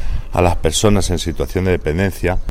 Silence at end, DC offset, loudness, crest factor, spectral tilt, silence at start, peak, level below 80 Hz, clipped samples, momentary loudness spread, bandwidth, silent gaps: 0 s; under 0.1%; -17 LUFS; 16 dB; -5 dB/octave; 0 s; 0 dBFS; -22 dBFS; under 0.1%; 6 LU; 16 kHz; none